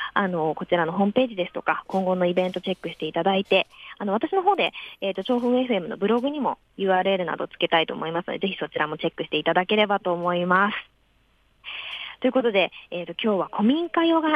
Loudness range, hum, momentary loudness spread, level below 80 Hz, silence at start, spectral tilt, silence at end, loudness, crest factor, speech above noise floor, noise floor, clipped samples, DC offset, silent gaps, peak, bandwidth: 1 LU; none; 9 LU; -66 dBFS; 0 s; -7 dB/octave; 0 s; -24 LUFS; 18 dB; 39 dB; -63 dBFS; under 0.1%; under 0.1%; none; -6 dBFS; 8.8 kHz